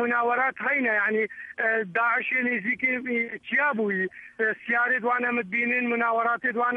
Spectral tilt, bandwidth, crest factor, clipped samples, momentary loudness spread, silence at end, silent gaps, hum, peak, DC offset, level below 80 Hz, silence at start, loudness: -7 dB/octave; 6 kHz; 14 dB; under 0.1%; 5 LU; 0 s; none; none; -12 dBFS; under 0.1%; -74 dBFS; 0 s; -25 LUFS